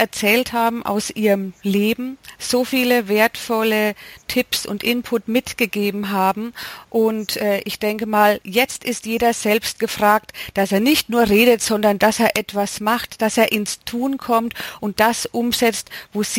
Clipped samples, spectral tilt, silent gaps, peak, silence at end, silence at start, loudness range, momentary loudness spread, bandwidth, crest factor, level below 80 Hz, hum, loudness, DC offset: under 0.1%; -3.5 dB/octave; none; -2 dBFS; 0 s; 0 s; 4 LU; 8 LU; 17 kHz; 18 dB; -52 dBFS; none; -19 LUFS; under 0.1%